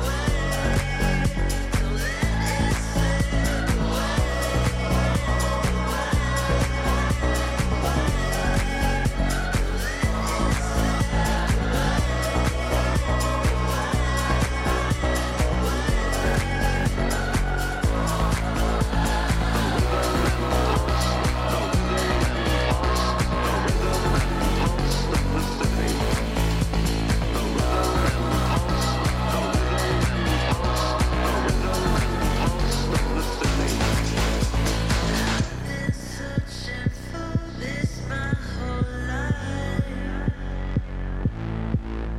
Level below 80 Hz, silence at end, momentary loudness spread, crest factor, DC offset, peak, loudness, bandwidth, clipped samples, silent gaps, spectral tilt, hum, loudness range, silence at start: -26 dBFS; 0 s; 5 LU; 14 dB; under 0.1%; -8 dBFS; -24 LUFS; 16 kHz; under 0.1%; none; -5 dB/octave; none; 5 LU; 0 s